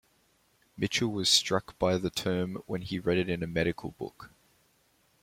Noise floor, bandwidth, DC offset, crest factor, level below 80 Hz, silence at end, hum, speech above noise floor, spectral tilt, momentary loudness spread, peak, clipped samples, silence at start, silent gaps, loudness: -69 dBFS; 16.5 kHz; under 0.1%; 22 dB; -58 dBFS; 0.95 s; none; 38 dB; -4 dB/octave; 14 LU; -10 dBFS; under 0.1%; 0.75 s; none; -29 LUFS